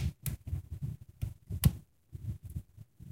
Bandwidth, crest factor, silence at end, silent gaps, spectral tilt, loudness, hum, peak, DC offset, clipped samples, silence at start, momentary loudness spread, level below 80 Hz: 16 kHz; 24 dB; 0 s; none; -5.5 dB/octave; -38 LUFS; none; -12 dBFS; under 0.1%; under 0.1%; 0 s; 20 LU; -44 dBFS